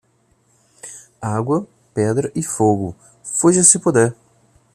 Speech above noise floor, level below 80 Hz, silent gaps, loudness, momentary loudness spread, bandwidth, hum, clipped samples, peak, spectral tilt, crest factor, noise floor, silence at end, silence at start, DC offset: 44 dB; -56 dBFS; none; -17 LUFS; 25 LU; 15 kHz; none; under 0.1%; 0 dBFS; -5 dB/octave; 20 dB; -60 dBFS; 0.6 s; 0.85 s; under 0.1%